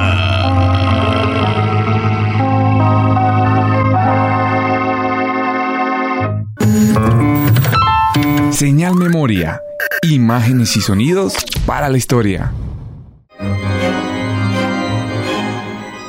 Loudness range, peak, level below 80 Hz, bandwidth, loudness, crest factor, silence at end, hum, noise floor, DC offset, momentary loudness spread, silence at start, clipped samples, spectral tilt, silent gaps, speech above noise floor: 5 LU; -2 dBFS; -34 dBFS; 16 kHz; -14 LUFS; 10 dB; 0 s; none; -36 dBFS; under 0.1%; 7 LU; 0 s; under 0.1%; -6 dB/octave; none; 22 dB